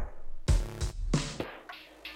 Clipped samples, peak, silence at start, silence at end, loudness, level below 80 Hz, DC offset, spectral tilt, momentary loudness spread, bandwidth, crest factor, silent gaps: under 0.1%; -14 dBFS; 0 s; 0 s; -34 LUFS; -34 dBFS; under 0.1%; -5 dB/octave; 14 LU; 15 kHz; 18 dB; none